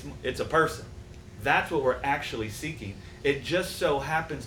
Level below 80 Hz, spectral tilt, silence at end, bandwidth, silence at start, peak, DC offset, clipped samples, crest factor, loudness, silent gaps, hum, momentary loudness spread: -48 dBFS; -4.5 dB/octave; 0 s; 19.5 kHz; 0 s; -8 dBFS; under 0.1%; under 0.1%; 20 dB; -28 LUFS; none; none; 15 LU